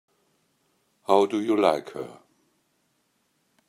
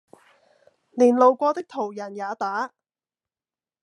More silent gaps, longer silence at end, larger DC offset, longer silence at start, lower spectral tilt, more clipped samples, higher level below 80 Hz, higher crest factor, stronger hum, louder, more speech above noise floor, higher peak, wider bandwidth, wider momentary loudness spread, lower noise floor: neither; first, 1.55 s vs 1.15 s; neither; first, 1.1 s vs 0.95 s; about the same, -5.5 dB/octave vs -5.5 dB/octave; neither; first, -76 dBFS vs -88 dBFS; about the same, 24 dB vs 20 dB; neither; about the same, -23 LUFS vs -22 LUFS; second, 48 dB vs over 69 dB; about the same, -4 dBFS vs -4 dBFS; first, 13.5 kHz vs 10 kHz; about the same, 18 LU vs 16 LU; second, -71 dBFS vs under -90 dBFS